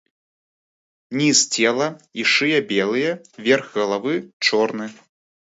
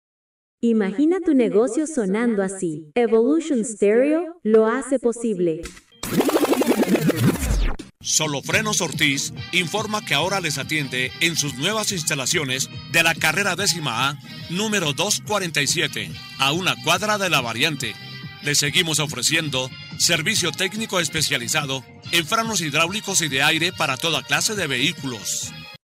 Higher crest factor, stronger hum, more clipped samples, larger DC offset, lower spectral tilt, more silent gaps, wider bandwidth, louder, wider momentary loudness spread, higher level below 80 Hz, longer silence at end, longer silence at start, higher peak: about the same, 20 dB vs 16 dB; neither; neither; neither; about the same, -2.5 dB/octave vs -3 dB/octave; first, 4.33-4.40 s vs none; second, 8 kHz vs 16 kHz; about the same, -19 LUFS vs -20 LUFS; first, 10 LU vs 7 LU; second, -72 dBFS vs -40 dBFS; first, 0.65 s vs 0.1 s; first, 1.1 s vs 0.65 s; about the same, -2 dBFS vs -4 dBFS